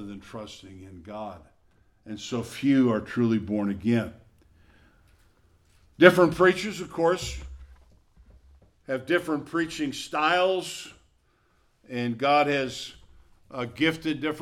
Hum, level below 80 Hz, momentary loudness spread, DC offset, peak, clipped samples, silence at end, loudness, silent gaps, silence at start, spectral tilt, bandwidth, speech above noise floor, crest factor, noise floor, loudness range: none; -54 dBFS; 20 LU; under 0.1%; 0 dBFS; under 0.1%; 0 s; -25 LUFS; none; 0 s; -5.5 dB/octave; 15 kHz; 40 dB; 26 dB; -66 dBFS; 6 LU